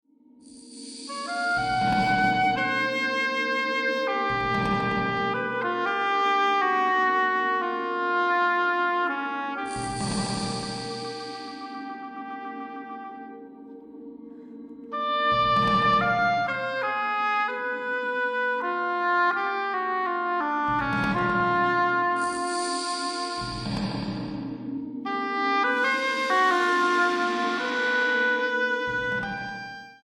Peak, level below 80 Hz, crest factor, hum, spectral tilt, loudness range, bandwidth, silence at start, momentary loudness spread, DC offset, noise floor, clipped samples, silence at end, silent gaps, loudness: -10 dBFS; -54 dBFS; 16 dB; none; -4 dB/octave; 8 LU; 16 kHz; 0.45 s; 15 LU; under 0.1%; -53 dBFS; under 0.1%; 0.1 s; none; -25 LUFS